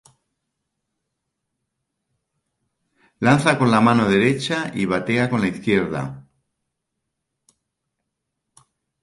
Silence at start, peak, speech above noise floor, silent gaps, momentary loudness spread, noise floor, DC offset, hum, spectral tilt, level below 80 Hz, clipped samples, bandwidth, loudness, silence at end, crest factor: 3.2 s; -2 dBFS; 61 dB; none; 8 LU; -79 dBFS; under 0.1%; none; -6 dB/octave; -56 dBFS; under 0.1%; 11.5 kHz; -19 LUFS; 2.8 s; 20 dB